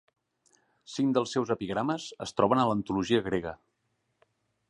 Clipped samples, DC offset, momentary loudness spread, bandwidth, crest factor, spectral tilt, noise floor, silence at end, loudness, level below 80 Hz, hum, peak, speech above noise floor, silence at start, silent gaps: under 0.1%; under 0.1%; 9 LU; 11 kHz; 22 dB; -5.5 dB/octave; -77 dBFS; 1.15 s; -29 LUFS; -60 dBFS; none; -10 dBFS; 49 dB; 0.9 s; none